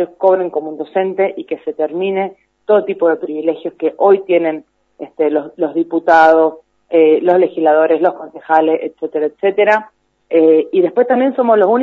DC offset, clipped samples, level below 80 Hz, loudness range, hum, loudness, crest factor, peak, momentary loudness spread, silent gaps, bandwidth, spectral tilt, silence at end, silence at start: under 0.1%; under 0.1%; -66 dBFS; 4 LU; none; -14 LUFS; 14 dB; 0 dBFS; 10 LU; none; 6.2 kHz; -7.5 dB/octave; 0 s; 0 s